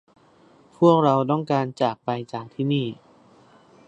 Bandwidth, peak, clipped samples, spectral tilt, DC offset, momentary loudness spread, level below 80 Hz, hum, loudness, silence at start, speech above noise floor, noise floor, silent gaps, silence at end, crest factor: 8.4 kHz; -4 dBFS; under 0.1%; -8 dB/octave; under 0.1%; 13 LU; -70 dBFS; none; -22 LUFS; 0.8 s; 33 dB; -55 dBFS; none; 0.95 s; 20 dB